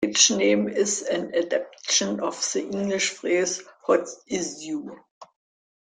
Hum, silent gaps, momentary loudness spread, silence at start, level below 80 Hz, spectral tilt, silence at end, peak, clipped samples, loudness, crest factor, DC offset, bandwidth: none; 5.11-5.21 s; 12 LU; 0 s; -68 dBFS; -2 dB/octave; 0.65 s; -4 dBFS; under 0.1%; -24 LUFS; 22 dB; under 0.1%; 11 kHz